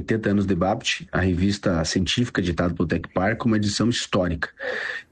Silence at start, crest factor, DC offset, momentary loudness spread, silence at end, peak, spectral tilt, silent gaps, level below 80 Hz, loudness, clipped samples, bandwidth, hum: 0 s; 14 dB; under 0.1%; 5 LU; 0.1 s; -8 dBFS; -5 dB/octave; none; -42 dBFS; -23 LUFS; under 0.1%; 9.8 kHz; none